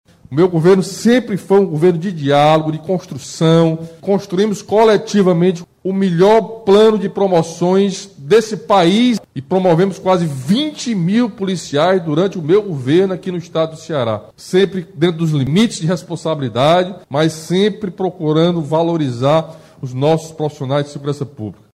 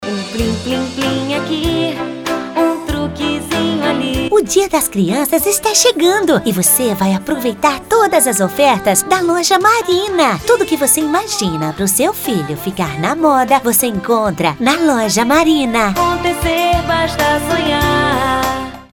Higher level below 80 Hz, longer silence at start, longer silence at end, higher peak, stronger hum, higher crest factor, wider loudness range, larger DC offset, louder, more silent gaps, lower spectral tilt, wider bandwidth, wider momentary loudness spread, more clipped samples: second, -54 dBFS vs -34 dBFS; first, 0.3 s vs 0 s; first, 0.25 s vs 0.1 s; about the same, -2 dBFS vs 0 dBFS; neither; about the same, 12 dB vs 14 dB; about the same, 4 LU vs 4 LU; neither; about the same, -15 LUFS vs -14 LUFS; neither; first, -6.5 dB/octave vs -3.5 dB/octave; second, 13.5 kHz vs 19.5 kHz; about the same, 10 LU vs 8 LU; neither